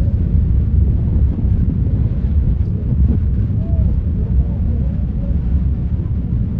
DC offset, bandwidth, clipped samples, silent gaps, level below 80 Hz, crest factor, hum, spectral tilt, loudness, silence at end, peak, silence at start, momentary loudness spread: under 0.1%; 2.5 kHz; under 0.1%; none; -18 dBFS; 12 dB; none; -12.5 dB/octave; -18 LUFS; 0 s; -4 dBFS; 0 s; 4 LU